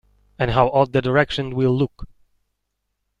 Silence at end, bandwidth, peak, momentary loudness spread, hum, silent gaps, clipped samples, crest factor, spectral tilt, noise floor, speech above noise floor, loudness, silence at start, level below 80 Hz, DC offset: 1.15 s; 9 kHz; -2 dBFS; 6 LU; 50 Hz at -60 dBFS; none; under 0.1%; 20 dB; -7.5 dB/octave; -76 dBFS; 57 dB; -20 LUFS; 0.4 s; -42 dBFS; under 0.1%